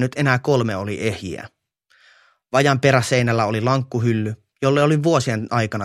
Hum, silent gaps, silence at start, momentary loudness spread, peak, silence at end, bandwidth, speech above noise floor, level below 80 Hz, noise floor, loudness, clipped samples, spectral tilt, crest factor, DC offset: none; none; 0 s; 8 LU; 0 dBFS; 0 s; 13.5 kHz; 41 dB; -56 dBFS; -60 dBFS; -19 LUFS; under 0.1%; -6 dB/octave; 20 dB; under 0.1%